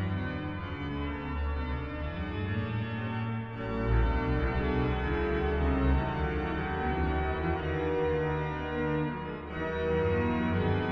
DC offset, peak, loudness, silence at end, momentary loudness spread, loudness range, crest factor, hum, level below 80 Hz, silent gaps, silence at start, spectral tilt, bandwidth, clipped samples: under 0.1%; -16 dBFS; -31 LUFS; 0 s; 7 LU; 5 LU; 14 dB; none; -36 dBFS; none; 0 s; -9 dB/octave; 6 kHz; under 0.1%